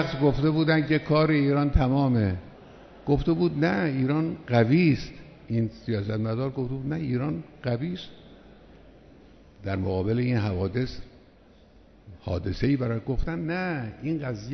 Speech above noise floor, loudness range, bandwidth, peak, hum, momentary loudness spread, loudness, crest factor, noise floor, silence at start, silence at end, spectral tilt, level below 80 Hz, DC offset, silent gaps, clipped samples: 30 dB; 7 LU; 6.4 kHz; -6 dBFS; none; 11 LU; -26 LUFS; 20 dB; -54 dBFS; 0 s; 0 s; -8.5 dB/octave; -40 dBFS; under 0.1%; none; under 0.1%